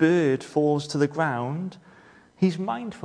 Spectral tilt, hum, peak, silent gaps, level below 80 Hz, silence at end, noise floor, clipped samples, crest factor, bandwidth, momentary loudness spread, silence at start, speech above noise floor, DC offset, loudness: -7 dB/octave; none; -8 dBFS; none; -68 dBFS; 0 s; -53 dBFS; under 0.1%; 18 dB; 10.5 kHz; 8 LU; 0 s; 29 dB; under 0.1%; -25 LUFS